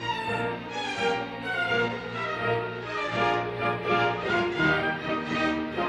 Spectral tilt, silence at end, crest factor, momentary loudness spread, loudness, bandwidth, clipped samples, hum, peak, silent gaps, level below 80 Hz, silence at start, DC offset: -5.5 dB/octave; 0 s; 16 dB; 7 LU; -27 LUFS; 12.5 kHz; under 0.1%; none; -12 dBFS; none; -56 dBFS; 0 s; under 0.1%